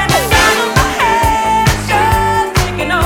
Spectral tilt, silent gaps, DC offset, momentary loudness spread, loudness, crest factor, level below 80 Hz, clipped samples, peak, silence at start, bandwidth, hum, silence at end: -4 dB/octave; none; under 0.1%; 5 LU; -12 LUFS; 12 dB; -24 dBFS; under 0.1%; 0 dBFS; 0 s; 18 kHz; none; 0 s